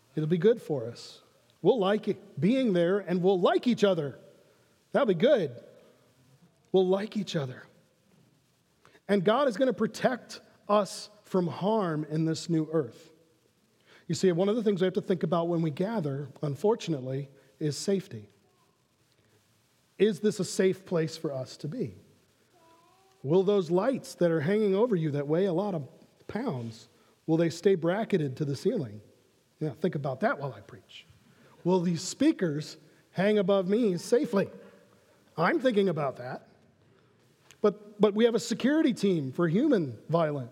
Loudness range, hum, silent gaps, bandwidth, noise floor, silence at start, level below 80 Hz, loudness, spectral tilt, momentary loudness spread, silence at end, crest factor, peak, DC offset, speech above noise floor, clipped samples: 5 LU; none; none; 14.5 kHz; -69 dBFS; 0.15 s; -78 dBFS; -28 LUFS; -6.5 dB/octave; 13 LU; 0 s; 20 dB; -8 dBFS; under 0.1%; 41 dB; under 0.1%